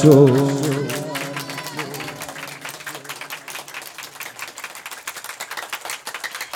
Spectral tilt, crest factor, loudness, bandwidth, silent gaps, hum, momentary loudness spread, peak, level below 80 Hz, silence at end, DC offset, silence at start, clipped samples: -5.5 dB/octave; 22 dB; -24 LUFS; 18 kHz; none; none; 14 LU; 0 dBFS; -68 dBFS; 0 s; under 0.1%; 0 s; under 0.1%